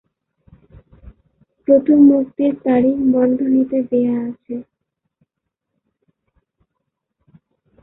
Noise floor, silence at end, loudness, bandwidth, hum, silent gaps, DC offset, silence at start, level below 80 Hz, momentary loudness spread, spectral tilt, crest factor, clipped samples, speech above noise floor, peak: -79 dBFS; 3.2 s; -15 LUFS; 3.6 kHz; none; none; under 0.1%; 1.7 s; -54 dBFS; 17 LU; -12.5 dB/octave; 18 dB; under 0.1%; 64 dB; -2 dBFS